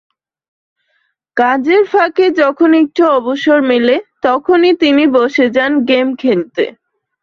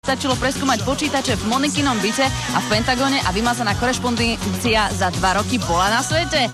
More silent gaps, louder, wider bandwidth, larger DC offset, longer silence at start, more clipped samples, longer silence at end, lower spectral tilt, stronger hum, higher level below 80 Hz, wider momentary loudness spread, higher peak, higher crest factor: neither; first, -12 LUFS vs -19 LUFS; second, 7 kHz vs 13.5 kHz; neither; first, 1.35 s vs 0.05 s; neither; first, 0.5 s vs 0 s; first, -5.5 dB/octave vs -3.5 dB/octave; neither; second, -58 dBFS vs -36 dBFS; first, 5 LU vs 2 LU; first, 0 dBFS vs -6 dBFS; about the same, 12 dB vs 14 dB